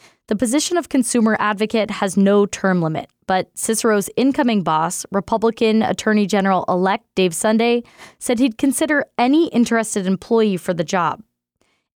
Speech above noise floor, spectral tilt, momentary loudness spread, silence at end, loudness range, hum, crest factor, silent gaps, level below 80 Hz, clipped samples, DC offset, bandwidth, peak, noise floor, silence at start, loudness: 49 dB; -4.5 dB/octave; 6 LU; 0.8 s; 1 LU; none; 12 dB; none; -56 dBFS; under 0.1%; under 0.1%; 18.5 kHz; -6 dBFS; -67 dBFS; 0.3 s; -18 LUFS